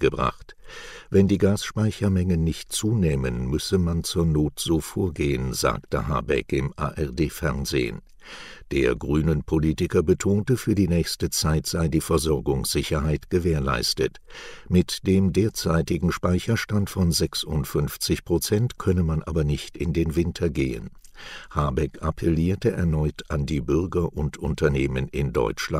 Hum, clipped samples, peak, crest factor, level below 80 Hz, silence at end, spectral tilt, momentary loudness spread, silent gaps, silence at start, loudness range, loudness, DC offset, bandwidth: none; under 0.1%; -6 dBFS; 18 dB; -36 dBFS; 0 s; -5.5 dB/octave; 6 LU; none; 0 s; 3 LU; -24 LUFS; under 0.1%; 16 kHz